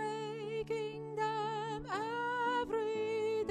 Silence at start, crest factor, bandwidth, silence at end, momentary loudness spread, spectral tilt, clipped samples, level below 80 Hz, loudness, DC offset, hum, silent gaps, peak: 0 s; 14 dB; 9.8 kHz; 0 s; 6 LU; -5 dB/octave; under 0.1%; -64 dBFS; -37 LUFS; under 0.1%; none; none; -24 dBFS